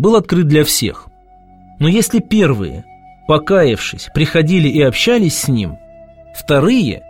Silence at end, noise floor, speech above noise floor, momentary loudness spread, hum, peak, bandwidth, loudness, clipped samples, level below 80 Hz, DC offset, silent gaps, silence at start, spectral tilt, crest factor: 0.1 s; -44 dBFS; 31 dB; 12 LU; none; 0 dBFS; 16.5 kHz; -13 LUFS; under 0.1%; -38 dBFS; under 0.1%; none; 0 s; -5 dB/octave; 14 dB